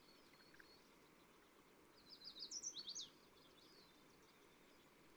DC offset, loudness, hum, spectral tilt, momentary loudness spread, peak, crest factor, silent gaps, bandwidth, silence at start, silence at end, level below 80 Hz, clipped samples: under 0.1%; -54 LUFS; none; 0 dB/octave; 20 LU; -38 dBFS; 22 dB; none; over 20 kHz; 0 s; 0 s; -86 dBFS; under 0.1%